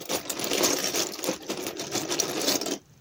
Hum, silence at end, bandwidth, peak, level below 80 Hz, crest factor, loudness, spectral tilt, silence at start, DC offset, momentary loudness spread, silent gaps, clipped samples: none; 0.2 s; 17.5 kHz; -8 dBFS; -66 dBFS; 22 dB; -27 LUFS; -1.5 dB/octave; 0 s; under 0.1%; 9 LU; none; under 0.1%